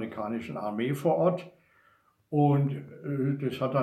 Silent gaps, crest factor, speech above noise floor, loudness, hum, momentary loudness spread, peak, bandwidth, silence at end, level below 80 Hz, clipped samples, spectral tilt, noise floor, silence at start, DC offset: none; 18 dB; 37 dB; -29 LUFS; none; 10 LU; -12 dBFS; 13.5 kHz; 0 s; -72 dBFS; under 0.1%; -8.5 dB/octave; -65 dBFS; 0 s; under 0.1%